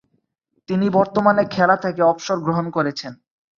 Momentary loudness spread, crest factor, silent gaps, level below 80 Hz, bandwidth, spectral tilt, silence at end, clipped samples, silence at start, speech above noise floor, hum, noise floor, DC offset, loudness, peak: 8 LU; 18 dB; none; -60 dBFS; 7.4 kHz; -6.5 dB/octave; 0.45 s; under 0.1%; 0.7 s; 51 dB; none; -70 dBFS; under 0.1%; -19 LUFS; -2 dBFS